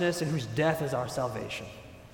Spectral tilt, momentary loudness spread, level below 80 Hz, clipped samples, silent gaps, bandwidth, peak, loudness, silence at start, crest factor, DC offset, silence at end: -5.5 dB/octave; 13 LU; -58 dBFS; under 0.1%; none; 19 kHz; -14 dBFS; -31 LUFS; 0 s; 16 dB; under 0.1%; 0 s